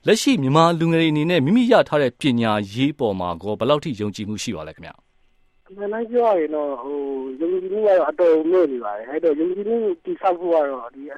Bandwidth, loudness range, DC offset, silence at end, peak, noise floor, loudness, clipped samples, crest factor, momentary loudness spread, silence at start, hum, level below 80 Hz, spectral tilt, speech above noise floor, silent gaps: 14 kHz; 7 LU; under 0.1%; 0 s; 0 dBFS; -58 dBFS; -20 LUFS; under 0.1%; 20 dB; 11 LU; 0.05 s; none; -58 dBFS; -6 dB/octave; 39 dB; none